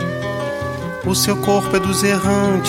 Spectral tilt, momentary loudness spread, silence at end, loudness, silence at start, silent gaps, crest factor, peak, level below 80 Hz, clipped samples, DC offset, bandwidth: -4.5 dB/octave; 8 LU; 0 s; -18 LUFS; 0 s; none; 16 dB; -2 dBFS; -44 dBFS; under 0.1%; under 0.1%; 16.5 kHz